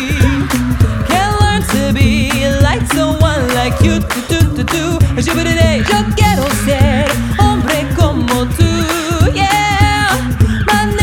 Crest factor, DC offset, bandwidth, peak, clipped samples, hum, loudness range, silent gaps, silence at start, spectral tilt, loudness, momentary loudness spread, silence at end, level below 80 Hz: 12 dB; under 0.1%; 18 kHz; 0 dBFS; under 0.1%; none; 1 LU; none; 0 s; -5 dB/octave; -12 LUFS; 3 LU; 0 s; -22 dBFS